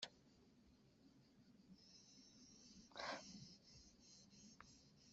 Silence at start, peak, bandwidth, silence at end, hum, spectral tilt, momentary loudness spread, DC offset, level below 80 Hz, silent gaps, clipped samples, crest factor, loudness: 0 s; -34 dBFS; 7.6 kHz; 0 s; none; -1.5 dB/octave; 15 LU; under 0.1%; -82 dBFS; none; under 0.1%; 28 dB; -59 LUFS